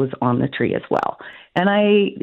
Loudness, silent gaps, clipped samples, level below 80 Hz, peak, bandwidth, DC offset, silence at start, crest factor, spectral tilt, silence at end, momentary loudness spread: -19 LUFS; none; under 0.1%; -58 dBFS; -4 dBFS; 6.4 kHz; under 0.1%; 0 s; 16 dB; -8.5 dB/octave; 0.05 s; 11 LU